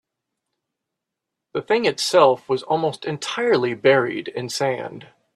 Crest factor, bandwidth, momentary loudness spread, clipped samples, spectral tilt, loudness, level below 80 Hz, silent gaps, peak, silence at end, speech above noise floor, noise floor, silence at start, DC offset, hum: 20 dB; 13.5 kHz; 13 LU; under 0.1%; -4 dB/octave; -20 LUFS; -68 dBFS; none; -2 dBFS; 0.3 s; 63 dB; -83 dBFS; 1.55 s; under 0.1%; none